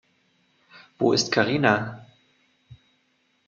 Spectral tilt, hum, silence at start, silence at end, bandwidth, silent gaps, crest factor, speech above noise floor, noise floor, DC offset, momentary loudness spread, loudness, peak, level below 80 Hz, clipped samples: -4.5 dB/octave; none; 0.75 s; 0.7 s; 7.8 kHz; none; 24 dB; 46 dB; -68 dBFS; under 0.1%; 14 LU; -22 LUFS; -4 dBFS; -64 dBFS; under 0.1%